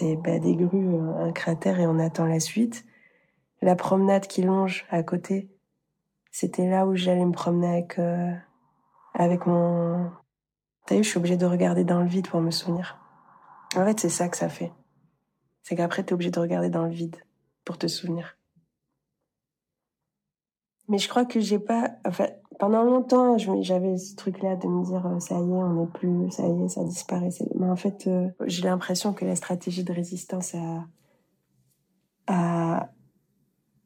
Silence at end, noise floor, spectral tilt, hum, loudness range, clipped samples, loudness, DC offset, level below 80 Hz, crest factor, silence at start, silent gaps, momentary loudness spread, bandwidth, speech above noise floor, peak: 1 s; under -90 dBFS; -6 dB/octave; none; 7 LU; under 0.1%; -26 LUFS; under 0.1%; -72 dBFS; 18 dB; 0 s; none; 9 LU; 15.5 kHz; over 65 dB; -8 dBFS